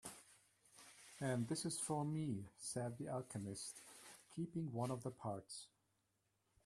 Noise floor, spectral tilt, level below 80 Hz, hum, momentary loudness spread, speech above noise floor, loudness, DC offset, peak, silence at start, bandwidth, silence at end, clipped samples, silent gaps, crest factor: -85 dBFS; -5 dB/octave; -80 dBFS; none; 17 LU; 40 dB; -46 LUFS; under 0.1%; -28 dBFS; 0.05 s; 14 kHz; 1 s; under 0.1%; none; 18 dB